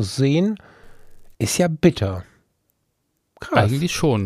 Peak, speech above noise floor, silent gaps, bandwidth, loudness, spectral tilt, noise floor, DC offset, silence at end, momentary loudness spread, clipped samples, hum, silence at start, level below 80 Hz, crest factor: -2 dBFS; 52 dB; none; 15.5 kHz; -20 LUFS; -5.5 dB/octave; -72 dBFS; under 0.1%; 0 s; 13 LU; under 0.1%; none; 0 s; -48 dBFS; 20 dB